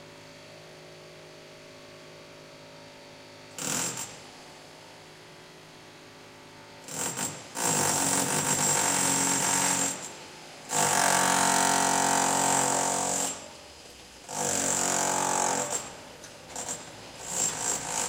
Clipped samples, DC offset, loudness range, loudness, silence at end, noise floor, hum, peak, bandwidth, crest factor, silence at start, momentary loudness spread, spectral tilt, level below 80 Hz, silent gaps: under 0.1%; under 0.1%; 14 LU; -26 LUFS; 0 s; -49 dBFS; none; -8 dBFS; 17 kHz; 22 dB; 0 s; 24 LU; -1.5 dB/octave; -66 dBFS; none